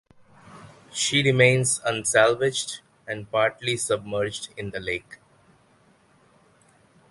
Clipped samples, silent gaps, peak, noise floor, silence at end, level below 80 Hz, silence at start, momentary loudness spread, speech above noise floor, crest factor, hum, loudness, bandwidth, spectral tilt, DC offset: under 0.1%; none; -4 dBFS; -60 dBFS; 1.95 s; -60 dBFS; 0.5 s; 15 LU; 36 dB; 22 dB; none; -23 LUFS; 12 kHz; -3.5 dB/octave; under 0.1%